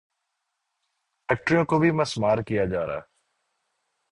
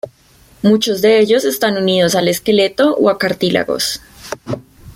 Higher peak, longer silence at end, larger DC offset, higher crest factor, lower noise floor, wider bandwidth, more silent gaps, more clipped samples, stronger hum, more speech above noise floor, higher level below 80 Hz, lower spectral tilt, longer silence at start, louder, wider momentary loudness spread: second, -6 dBFS vs -2 dBFS; first, 1.1 s vs 0.05 s; neither; first, 20 dB vs 14 dB; first, -79 dBFS vs -48 dBFS; second, 11 kHz vs 17 kHz; neither; neither; neither; first, 56 dB vs 34 dB; about the same, -54 dBFS vs -50 dBFS; first, -6.5 dB/octave vs -4.5 dB/octave; first, 1.3 s vs 0.05 s; second, -24 LUFS vs -14 LUFS; second, 11 LU vs 15 LU